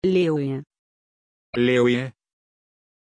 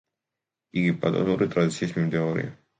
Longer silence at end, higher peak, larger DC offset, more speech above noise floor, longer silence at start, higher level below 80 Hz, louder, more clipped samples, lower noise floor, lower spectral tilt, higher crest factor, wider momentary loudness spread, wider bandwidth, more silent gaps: first, 0.95 s vs 0.25 s; about the same, -8 dBFS vs -8 dBFS; neither; first, over 69 dB vs 63 dB; second, 0 s vs 0.75 s; about the same, -60 dBFS vs -60 dBFS; first, -22 LUFS vs -25 LUFS; neither; about the same, under -90 dBFS vs -87 dBFS; about the same, -7 dB/octave vs -7 dB/octave; about the same, 16 dB vs 18 dB; first, 14 LU vs 5 LU; about the same, 10 kHz vs 9.4 kHz; first, 0.79-1.53 s vs none